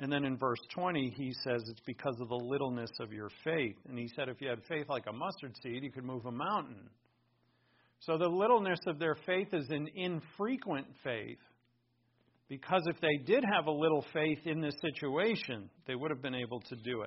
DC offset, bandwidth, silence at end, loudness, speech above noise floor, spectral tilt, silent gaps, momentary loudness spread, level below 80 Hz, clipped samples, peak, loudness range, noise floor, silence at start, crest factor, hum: under 0.1%; 5.8 kHz; 0 s; -36 LUFS; 40 dB; -4 dB/octave; none; 12 LU; -76 dBFS; under 0.1%; -16 dBFS; 7 LU; -76 dBFS; 0 s; 20 dB; none